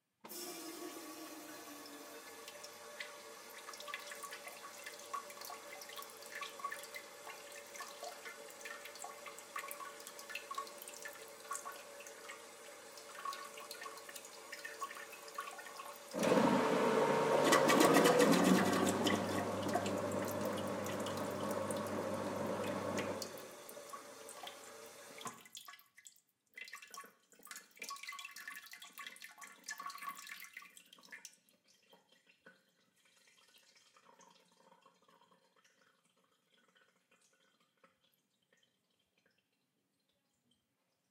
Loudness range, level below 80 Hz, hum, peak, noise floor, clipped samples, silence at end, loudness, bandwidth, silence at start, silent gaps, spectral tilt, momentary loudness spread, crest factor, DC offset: 20 LU; -86 dBFS; none; -14 dBFS; -83 dBFS; under 0.1%; 6.85 s; -39 LUFS; 17.5 kHz; 0.25 s; none; -4 dB/octave; 21 LU; 28 dB; under 0.1%